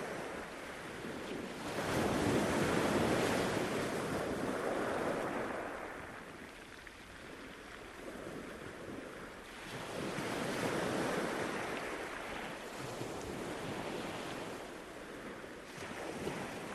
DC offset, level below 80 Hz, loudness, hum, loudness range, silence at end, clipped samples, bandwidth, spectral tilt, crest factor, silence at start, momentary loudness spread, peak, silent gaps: under 0.1%; -60 dBFS; -39 LUFS; none; 12 LU; 0 s; under 0.1%; 13.5 kHz; -4.5 dB/octave; 20 dB; 0 s; 15 LU; -20 dBFS; none